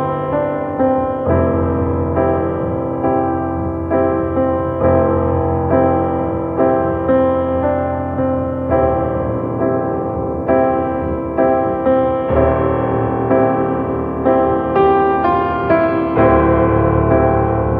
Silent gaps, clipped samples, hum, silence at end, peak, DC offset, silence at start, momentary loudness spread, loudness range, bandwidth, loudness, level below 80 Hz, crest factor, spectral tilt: none; under 0.1%; none; 0 s; 0 dBFS; under 0.1%; 0 s; 6 LU; 3 LU; 4.6 kHz; -16 LUFS; -32 dBFS; 14 dB; -11.5 dB/octave